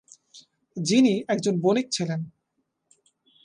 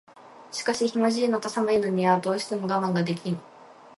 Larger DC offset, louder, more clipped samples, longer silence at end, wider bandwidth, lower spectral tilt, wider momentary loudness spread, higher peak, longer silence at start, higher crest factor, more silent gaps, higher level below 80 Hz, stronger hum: neither; about the same, -24 LUFS vs -26 LUFS; neither; first, 1.15 s vs 0.05 s; about the same, 11 kHz vs 11.5 kHz; about the same, -5 dB/octave vs -5.5 dB/octave; first, 14 LU vs 8 LU; about the same, -10 dBFS vs -8 dBFS; about the same, 0.35 s vs 0.25 s; about the same, 18 dB vs 18 dB; neither; about the same, -72 dBFS vs -68 dBFS; neither